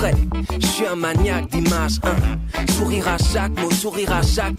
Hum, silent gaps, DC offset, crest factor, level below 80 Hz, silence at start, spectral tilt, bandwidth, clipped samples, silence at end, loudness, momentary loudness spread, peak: none; none; under 0.1%; 12 dB; -24 dBFS; 0 s; -5 dB/octave; 16 kHz; under 0.1%; 0 s; -20 LUFS; 2 LU; -6 dBFS